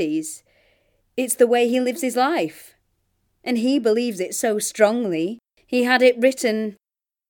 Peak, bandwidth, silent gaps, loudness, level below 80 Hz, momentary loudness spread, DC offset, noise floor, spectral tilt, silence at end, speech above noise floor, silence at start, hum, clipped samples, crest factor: -2 dBFS; 19.5 kHz; none; -20 LUFS; -70 dBFS; 14 LU; under 0.1%; -69 dBFS; -3.5 dB/octave; 0.55 s; 49 dB; 0 s; none; under 0.1%; 20 dB